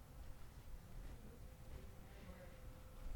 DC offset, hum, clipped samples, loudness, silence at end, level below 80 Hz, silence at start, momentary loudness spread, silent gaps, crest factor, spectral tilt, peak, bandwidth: under 0.1%; none; under 0.1%; -59 LUFS; 0 s; -56 dBFS; 0 s; 2 LU; none; 20 dB; -5.5 dB/octave; -34 dBFS; 19 kHz